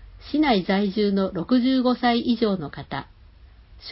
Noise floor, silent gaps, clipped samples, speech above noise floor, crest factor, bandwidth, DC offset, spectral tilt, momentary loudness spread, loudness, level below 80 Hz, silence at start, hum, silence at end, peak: -49 dBFS; none; under 0.1%; 27 dB; 16 dB; 5.8 kHz; under 0.1%; -10.5 dB/octave; 13 LU; -22 LUFS; -48 dBFS; 0 s; none; 0 s; -8 dBFS